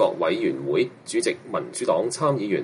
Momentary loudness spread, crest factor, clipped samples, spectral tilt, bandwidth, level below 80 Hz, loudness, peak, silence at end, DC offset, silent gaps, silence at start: 4 LU; 16 dB; under 0.1%; -5 dB/octave; 11.5 kHz; -68 dBFS; -24 LUFS; -8 dBFS; 0 s; under 0.1%; none; 0 s